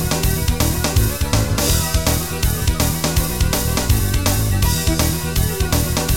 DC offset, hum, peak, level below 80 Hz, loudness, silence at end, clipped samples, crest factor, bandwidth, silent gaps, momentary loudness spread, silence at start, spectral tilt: 2%; none; -4 dBFS; -22 dBFS; -18 LUFS; 0 s; under 0.1%; 14 dB; 17 kHz; none; 2 LU; 0 s; -4 dB/octave